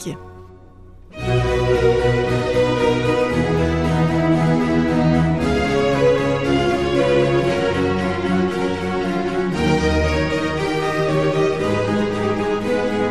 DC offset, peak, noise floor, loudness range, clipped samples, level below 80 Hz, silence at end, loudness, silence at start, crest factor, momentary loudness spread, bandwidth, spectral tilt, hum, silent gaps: 0.8%; -4 dBFS; -42 dBFS; 2 LU; under 0.1%; -34 dBFS; 0 s; -18 LUFS; 0 s; 14 dB; 4 LU; 12.5 kHz; -6.5 dB/octave; none; none